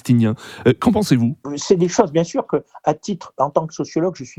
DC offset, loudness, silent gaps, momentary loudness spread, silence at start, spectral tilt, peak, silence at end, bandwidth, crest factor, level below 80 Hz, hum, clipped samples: under 0.1%; -19 LUFS; none; 8 LU; 0.05 s; -6.5 dB/octave; 0 dBFS; 0.1 s; 15 kHz; 18 dB; -54 dBFS; none; under 0.1%